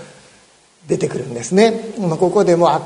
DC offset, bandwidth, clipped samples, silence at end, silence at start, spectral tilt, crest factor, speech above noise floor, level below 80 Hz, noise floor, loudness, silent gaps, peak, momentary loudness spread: under 0.1%; 11 kHz; under 0.1%; 0 s; 0 s; -6 dB/octave; 16 dB; 35 dB; -58 dBFS; -50 dBFS; -16 LUFS; none; 0 dBFS; 9 LU